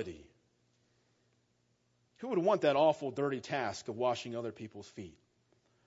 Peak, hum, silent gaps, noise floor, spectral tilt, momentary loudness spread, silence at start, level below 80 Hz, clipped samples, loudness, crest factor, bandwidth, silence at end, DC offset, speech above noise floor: -16 dBFS; none; none; -76 dBFS; -4.5 dB/octave; 20 LU; 0 s; -78 dBFS; under 0.1%; -33 LUFS; 22 dB; 7.6 kHz; 0.75 s; under 0.1%; 42 dB